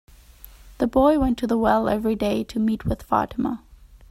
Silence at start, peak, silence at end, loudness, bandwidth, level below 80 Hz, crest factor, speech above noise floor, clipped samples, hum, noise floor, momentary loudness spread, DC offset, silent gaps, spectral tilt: 0.45 s; -6 dBFS; 0.15 s; -22 LUFS; 15 kHz; -40 dBFS; 16 dB; 25 dB; under 0.1%; none; -47 dBFS; 9 LU; under 0.1%; none; -7 dB/octave